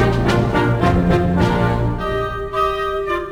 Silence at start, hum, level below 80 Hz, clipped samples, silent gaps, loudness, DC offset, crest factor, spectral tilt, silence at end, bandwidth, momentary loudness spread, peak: 0 s; none; -28 dBFS; under 0.1%; none; -18 LUFS; under 0.1%; 14 dB; -7.5 dB/octave; 0 s; 15 kHz; 6 LU; -2 dBFS